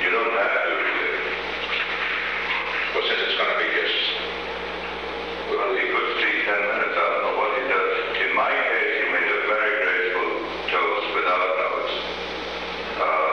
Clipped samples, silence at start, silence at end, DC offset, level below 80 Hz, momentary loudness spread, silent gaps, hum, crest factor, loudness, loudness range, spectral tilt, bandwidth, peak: under 0.1%; 0 s; 0 s; 0.2%; -54 dBFS; 8 LU; none; none; 14 dB; -22 LUFS; 2 LU; -3.5 dB/octave; 9 kHz; -10 dBFS